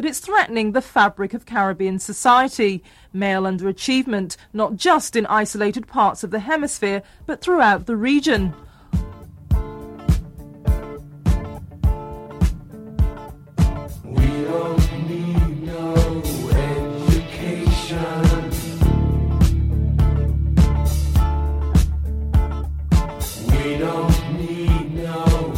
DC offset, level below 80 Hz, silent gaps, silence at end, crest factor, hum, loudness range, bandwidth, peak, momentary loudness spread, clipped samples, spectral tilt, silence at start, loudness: under 0.1%; -24 dBFS; none; 0 s; 16 dB; none; 5 LU; 16.5 kHz; -2 dBFS; 9 LU; under 0.1%; -6 dB/octave; 0 s; -20 LUFS